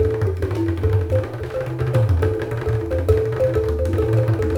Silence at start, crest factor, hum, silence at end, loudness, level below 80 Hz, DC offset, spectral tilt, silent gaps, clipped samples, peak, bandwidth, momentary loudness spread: 0 s; 16 dB; none; 0 s; -21 LUFS; -30 dBFS; under 0.1%; -8.5 dB/octave; none; under 0.1%; -4 dBFS; 15 kHz; 5 LU